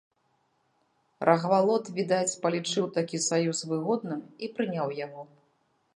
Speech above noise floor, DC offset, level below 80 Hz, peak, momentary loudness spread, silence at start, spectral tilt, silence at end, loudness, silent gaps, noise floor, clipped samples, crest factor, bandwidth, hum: 44 dB; under 0.1%; -80 dBFS; -6 dBFS; 13 LU; 1.2 s; -4.5 dB/octave; 0.7 s; -28 LUFS; none; -72 dBFS; under 0.1%; 24 dB; 11.5 kHz; none